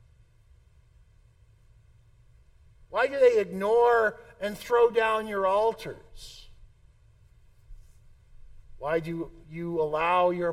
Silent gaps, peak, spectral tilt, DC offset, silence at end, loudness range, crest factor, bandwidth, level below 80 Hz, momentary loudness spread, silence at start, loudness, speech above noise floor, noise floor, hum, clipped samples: none; -10 dBFS; -5.5 dB/octave; under 0.1%; 0 s; 14 LU; 20 dB; 14.5 kHz; -54 dBFS; 18 LU; 2.9 s; -26 LUFS; 33 dB; -59 dBFS; none; under 0.1%